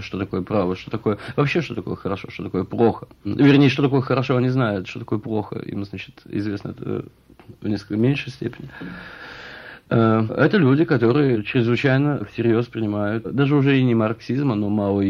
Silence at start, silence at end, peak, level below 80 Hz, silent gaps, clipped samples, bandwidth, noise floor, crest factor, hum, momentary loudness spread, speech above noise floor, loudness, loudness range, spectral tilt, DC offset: 0 s; 0 s; -4 dBFS; -54 dBFS; none; under 0.1%; 6.8 kHz; -39 dBFS; 18 dB; none; 14 LU; 19 dB; -21 LUFS; 8 LU; -8.5 dB/octave; under 0.1%